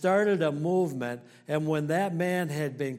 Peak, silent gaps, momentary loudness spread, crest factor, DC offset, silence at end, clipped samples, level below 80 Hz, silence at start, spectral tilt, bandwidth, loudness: -12 dBFS; none; 9 LU; 16 dB; under 0.1%; 0 s; under 0.1%; -74 dBFS; 0 s; -6.5 dB/octave; 16 kHz; -28 LUFS